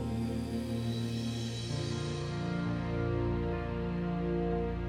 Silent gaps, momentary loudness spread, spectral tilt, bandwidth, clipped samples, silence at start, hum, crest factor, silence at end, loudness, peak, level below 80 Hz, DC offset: none; 3 LU; -7 dB/octave; 15 kHz; under 0.1%; 0 s; none; 12 dB; 0 s; -35 LUFS; -22 dBFS; -46 dBFS; under 0.1%